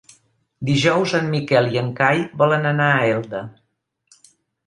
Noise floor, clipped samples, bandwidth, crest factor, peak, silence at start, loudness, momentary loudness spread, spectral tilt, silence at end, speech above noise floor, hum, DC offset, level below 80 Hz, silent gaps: -61 dBFS; under 0.1%; 11 kHz; 18 dB; -2 dBFS; 0.6 s; -18 LUFS; 12 LU; -6 dB/octave; 1.15 s; 43 dB; none; under 0.1%; -58 dBFS; none